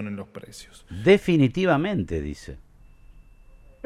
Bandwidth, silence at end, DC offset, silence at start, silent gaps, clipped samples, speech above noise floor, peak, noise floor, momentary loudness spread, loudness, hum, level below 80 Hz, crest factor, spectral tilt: 13 kHz; 1.3 s; under 0.1%; 0 s; none; under 0.1%; 26 dB; -6 dBFS; -50 dBFS; 24 LU; -22 LUFS; none; -46 dBFS; 20 dB; -7 dB/octave